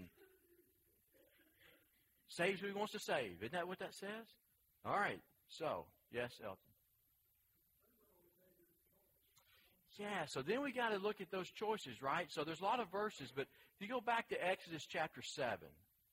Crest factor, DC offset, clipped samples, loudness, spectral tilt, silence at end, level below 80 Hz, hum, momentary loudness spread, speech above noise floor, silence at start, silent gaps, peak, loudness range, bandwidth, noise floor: 22 dB; under 0.1%; under 0.1%; -44 LUFS; -4 dB/octave; 0.4 s; -82 dBFS; none; 13 LU; 35 dB; 0 s; none; -24 dBFS; 9 LU; 16 kHz; -79 dBFS